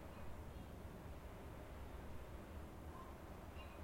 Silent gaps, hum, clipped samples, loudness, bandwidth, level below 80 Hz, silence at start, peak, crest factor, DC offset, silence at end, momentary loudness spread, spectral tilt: none; none; under 0.1%; -55 LUFS; 16.5 kHz; -58 dBFS; 0 s; -40 dBFS; 14 dB; under 0.1%; 0 s; 1 LU; -6.5 dB/octave